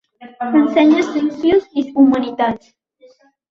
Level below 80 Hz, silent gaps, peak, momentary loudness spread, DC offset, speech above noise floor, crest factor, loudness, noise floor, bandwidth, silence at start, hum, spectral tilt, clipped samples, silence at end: -56 dBFS; none; -2 dBFS; 8 LU; under 0.1%; 35 dB; 14 dB; -15 LUFS; -50 dBFS; 7.2 kHz; 0.2 s; none; -6 dB/octave; under 0.1%; 0.95 s